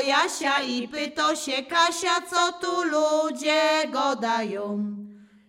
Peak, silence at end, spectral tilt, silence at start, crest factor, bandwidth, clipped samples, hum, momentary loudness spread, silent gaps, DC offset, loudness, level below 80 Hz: -8 dBFS; 0.25 s; -2.5 dB/octave; 0 s; 16 dB; 16.5 kHz; under 0.1%; none; 8 LU; none; under 0.1%; -24 LUFS; -72 dBFS